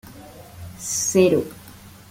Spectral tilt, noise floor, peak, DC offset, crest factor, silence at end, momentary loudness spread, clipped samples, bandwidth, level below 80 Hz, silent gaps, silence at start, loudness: -4 dB/octave; -44 dBFS; -4 dBFS; under 0.1%; 20 dB; 0.2 s; 25 LU; under 0.1%; 17 kHz; -54 dBFS; none; 0.05 s; -20 LUFS